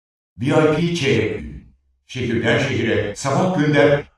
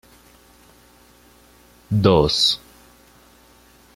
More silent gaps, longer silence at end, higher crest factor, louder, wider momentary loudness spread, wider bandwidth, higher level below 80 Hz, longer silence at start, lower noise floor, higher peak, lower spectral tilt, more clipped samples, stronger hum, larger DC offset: neither; second, 0.1 s vs 1.4 s; second, 16 dB vs 22 dB; about the same, -18 LUFS vs -18 LUFS; about the same, 11 LU vs 10 LU; second, 12 kHz vs 16 kHz; about the same, -46 dBFS vs -44 dBFS; second, 0.4 s vs 1.9 s; about the same, -51 dBFS vs -52 dBFS; about the same, -2 dBFS vs -2 dBFS; about the same, -6 dB/octave vs -5.5 dB/octave; neither; second, none vs 60 Hz at -50 dBFS; neither